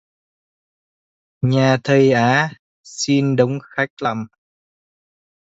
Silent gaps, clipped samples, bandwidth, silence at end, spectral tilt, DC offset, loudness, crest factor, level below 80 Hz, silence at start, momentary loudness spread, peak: 2.59-2.84 s, 3.90-3.97 s; under 0.1%; 8 kHz; 1.15 s; -6 dB/octave; under 0.1%; -17 LUFS; 20 dB; -60 dBFS; 1.4 s; 11 LU; 0 dBFS